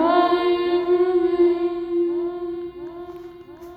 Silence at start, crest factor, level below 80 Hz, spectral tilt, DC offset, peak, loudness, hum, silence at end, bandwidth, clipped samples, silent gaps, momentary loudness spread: 0 s; 16 dB; -56 dBFS; -7 dB/octave; under 0.1%; -6 dBFS; -21 LUFS; none; 0 s; 5 kHz; under 0.1%; none; 19 LU